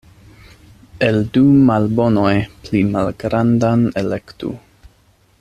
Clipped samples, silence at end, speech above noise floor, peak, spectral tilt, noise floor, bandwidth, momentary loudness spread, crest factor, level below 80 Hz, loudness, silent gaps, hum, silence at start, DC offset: under 0.1%; 0.8 s; 39 dB; -2 dBFS; -8 dB/octave; -54 dBFS; 10 kHz; 13 LU; 16 dB; -44 dBFS; -16 LUFS; none; none; 0.95 s; under 0.1%